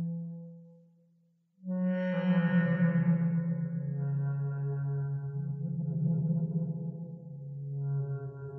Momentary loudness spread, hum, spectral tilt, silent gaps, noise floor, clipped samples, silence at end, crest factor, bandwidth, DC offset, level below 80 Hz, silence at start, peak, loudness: 15 LU; none; -9.5 dB/octave; none; -69 dBFS; under 0.1%; 0 s; 14 dB; 3.3 kHz; under 0.1%; -74 dBFS; 0 s; -18 dBFS; -32 LUFS